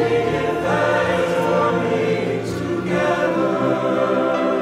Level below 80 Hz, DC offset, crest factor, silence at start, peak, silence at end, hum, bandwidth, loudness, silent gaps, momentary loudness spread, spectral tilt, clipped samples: -52 dBFS; under 0.1%; 12 dB; 0 s; -6 dBFS; 0 s; none; 15.5 kHz; -19 LUFS; none; 4 LU; -6.5 dB/octave; under 0.1%